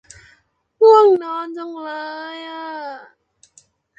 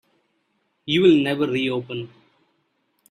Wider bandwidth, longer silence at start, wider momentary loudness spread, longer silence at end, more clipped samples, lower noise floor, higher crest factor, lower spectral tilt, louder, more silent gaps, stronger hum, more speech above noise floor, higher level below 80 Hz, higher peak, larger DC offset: second, 8.6 kHz vs 10.5 kHz; about the same, 0.8 s vs 0.85 s; about the same, 20 LU vs 20 LU; about the same, 1 s vs 1.05 s; neither; second, -59 dBFS vs -70 dBFS; about the same, 18 dB vs 18 dB; second, -4 dB/octave vs -6.5 dB/octave; first, -16 LUFS vs -20 LUFS; neither; neither; second, 30 dB vs 50 dB; about the same, -66 dBFS vs -62 dBFS; about the same, -2 dBFS vs -4 dBFS; neither